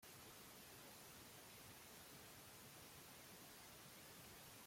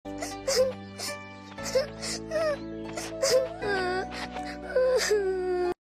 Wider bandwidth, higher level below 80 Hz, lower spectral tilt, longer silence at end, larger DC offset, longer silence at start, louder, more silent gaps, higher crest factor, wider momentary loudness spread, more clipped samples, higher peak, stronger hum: about the same, 16.5 kHz vs 15.5 kHz; second, -80 dBFS vs -52 dBFS; about the same, -2.5 dB/octave vs -3 dB/octave; about the same, 0 s vs 0.05 s; neither; about the same, 0 s vs 0.05 s; second, -59 LUFS vs -29 LUFS; neither; about the same, 14 dB vs 16 dB; second, 0 LU vs 11 LU; neither; second, -48 dBFS vs -14 dBFS; neither